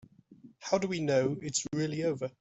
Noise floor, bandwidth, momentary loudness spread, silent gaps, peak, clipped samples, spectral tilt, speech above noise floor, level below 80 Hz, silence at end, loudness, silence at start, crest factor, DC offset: -57 dBFS; 8.2 kHz; 5 LU; none; -14 dBFS; under 0.1%; -4.5 dB/octave; 26 dB; -70 dBFS; 0.1 s; -31 LUFS; 0.3 s; 18 dB; under 0.1%